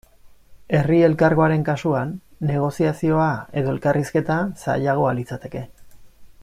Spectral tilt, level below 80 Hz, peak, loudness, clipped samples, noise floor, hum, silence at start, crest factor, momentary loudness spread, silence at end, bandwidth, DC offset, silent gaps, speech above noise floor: -8 dB/octave; -50 dBFS; -4 dBFS; -21 LUFS; under 0.1%; -47 dBFS; none; 0.25 s; 16 dB; 14 LU; 0.15 s; 14 kHz; under 0.1%; none; 28 dB